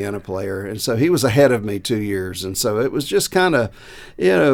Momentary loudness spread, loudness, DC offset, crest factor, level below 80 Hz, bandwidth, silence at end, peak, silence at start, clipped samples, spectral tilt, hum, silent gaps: 11 LU; -19 LUFS; under 0.1%; 18 dB; -48 dBFS; 18.5 kHz; 0 s; -2 dBFS; 0 s; under 0.1%; -5 dB/octave; none; none